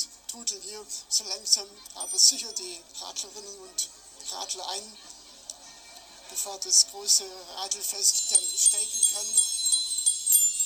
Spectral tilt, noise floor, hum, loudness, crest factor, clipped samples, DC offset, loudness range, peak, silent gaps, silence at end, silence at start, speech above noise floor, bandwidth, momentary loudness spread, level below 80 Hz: 3 dB/octave; -49 dBFS; none; -23 LUFS; 24 dB; under 0.1%; under 0.1%; 13 LU; -4 dBFS; none; 0 s; 0 s; 21 dB; 17 kHz; 19 LU; -70 dBFS